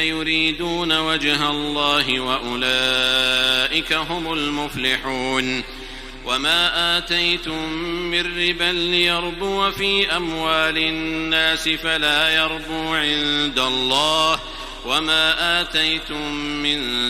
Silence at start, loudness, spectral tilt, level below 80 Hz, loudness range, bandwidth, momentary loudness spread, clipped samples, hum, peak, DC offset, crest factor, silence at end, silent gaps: 0 s; -19 LUFS; -2.5 dB/octave; -40 dBFS; 2 LU; 16 kHz; 8 LU; under 0.1%; none; -4 dBFS; under 0.1%; 18 dB; 0 s; none